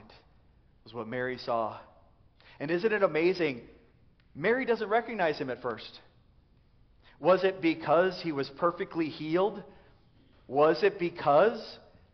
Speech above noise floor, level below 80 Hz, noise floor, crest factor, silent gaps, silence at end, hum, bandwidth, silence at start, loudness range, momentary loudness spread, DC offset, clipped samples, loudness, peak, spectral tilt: 34 dB; -64 dBFS; -62 dBFS; 20 dB; none; 0.35 s; none; 6.4 kHz; 0.85 s; 4 LU; 16 LU; under 0.1%; under 0.1%; -29 LUFS; -12 dBFS; -4 dB/octave